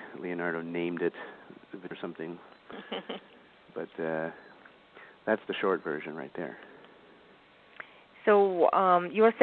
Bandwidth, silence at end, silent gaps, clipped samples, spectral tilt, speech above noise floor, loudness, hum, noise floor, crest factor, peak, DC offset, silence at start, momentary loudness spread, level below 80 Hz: 4.4 kHz; 0 s; none; under 0.1%; -9 dB/octave; 29 dB; -30 LUFS; none; -58 dBFS; 24 dB; -6 dBFS; under 0.1%; 0 s; 24 LU; -78 dBFS